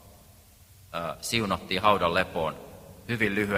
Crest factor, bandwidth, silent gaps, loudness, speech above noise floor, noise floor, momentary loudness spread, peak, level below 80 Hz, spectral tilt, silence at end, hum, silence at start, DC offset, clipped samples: 22 dB; 16 kHz; none; -27 LUFS; 27 dB; -54 dBFS; 18 LU; -6 dBFS; -54 dBFS; -4.5 dB/octave; 0 s; none; 0.05 s; under 0.1%; under 0.1%